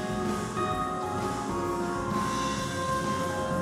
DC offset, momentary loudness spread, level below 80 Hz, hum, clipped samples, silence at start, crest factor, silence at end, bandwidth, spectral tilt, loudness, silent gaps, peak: under 0.1%; 2 LU; -48 dBFS; none; under 0.1%; 0 s; 12 dB; 0 s; 16 kHz; -5 dB/octave; -30 LUFS; none; -16 dBFS